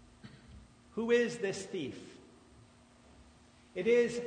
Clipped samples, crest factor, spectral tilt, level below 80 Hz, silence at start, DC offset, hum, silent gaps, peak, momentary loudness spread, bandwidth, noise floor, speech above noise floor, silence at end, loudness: under 0.1%; 18 dB; -4.5 dB/octave; -66 dBFS; 0.25 s; under 0.1%; none; none; -18 dBFS; 26 LU; 9.6 kHz; -61 dBFS; 29 dB; 0 s; -33 LUFS